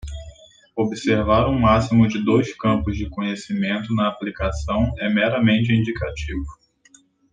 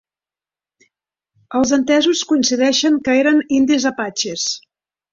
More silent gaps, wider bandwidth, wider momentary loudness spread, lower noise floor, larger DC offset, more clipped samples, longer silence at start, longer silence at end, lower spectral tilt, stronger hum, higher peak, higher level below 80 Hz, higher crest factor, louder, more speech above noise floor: neither; first, 9.2 kHz vs 7.6 kHz; first, 12 LU vs 7 LU; second, -55 dBFS vs under -90 dBFS; neither; neither; second, 0.05 s vs 1.5 s; first, 0.8 s vs 0.55 s; first, -7 dB/octave vs -2.5 dB/octave; neither; about the same, -4 dBFS vs -2 dBFS; first, -36 dBFS vs -56 dBFS; about the same, 18 dB vs 14 dB; second, -20 LUFS vs -16 LUFS; second, 35 dB vs over 74 dB